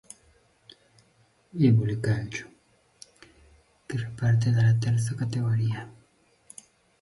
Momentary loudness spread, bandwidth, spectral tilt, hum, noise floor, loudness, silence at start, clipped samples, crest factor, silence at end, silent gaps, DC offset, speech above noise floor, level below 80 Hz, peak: 25 LU; 11.5 kHz; -7 dB/octave; none; -64 dBFS; -26 LUFS; 1.55 s; under 0.1%; 16 dB; 1.1 s; none; under 0.1%; 40 dB; -56 dBFS; -10 dBFS